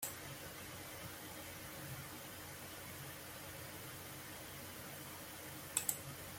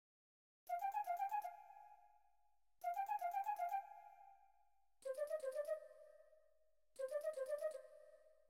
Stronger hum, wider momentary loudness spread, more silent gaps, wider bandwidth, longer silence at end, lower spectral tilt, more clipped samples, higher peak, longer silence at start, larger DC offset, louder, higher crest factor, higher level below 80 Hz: neither; second, 8 LU vs 21 LU; neither; about the same, 16.5 kHz vs 16 kHz; second, 0 s vs 0.2 s; first, -2.5 dB/octave vs -0.5 dB/octave; neither; first, -16 dBFS vs -34 dBFS; second, 0 s vs 0.65 s; neither; about the same, -47 LUFS vs -46 LUFS; first, 32 dB vs 14 dB; first, -70 dBFS vs under -90 dBFS